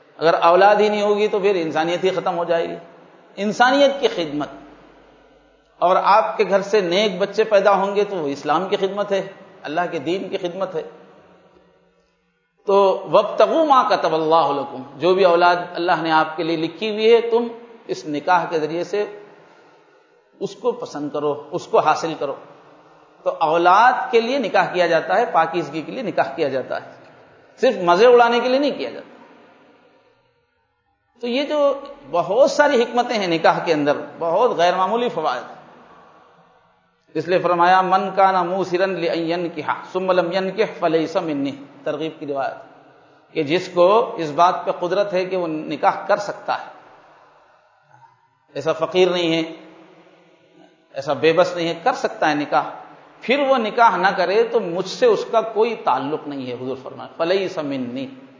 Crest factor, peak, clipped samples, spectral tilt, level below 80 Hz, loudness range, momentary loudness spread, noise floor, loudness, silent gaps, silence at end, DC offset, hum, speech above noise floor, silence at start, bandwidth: 20 dB; 0 dBFS; under 0.1%; -5 dB/octave; -72 dBFS; 6 LU; 13 LU; -67 dBFS; -19 LUFS; none; 0.15 s; under 0.1%; none; 48 dB; 0.2 s; 7.6 kHz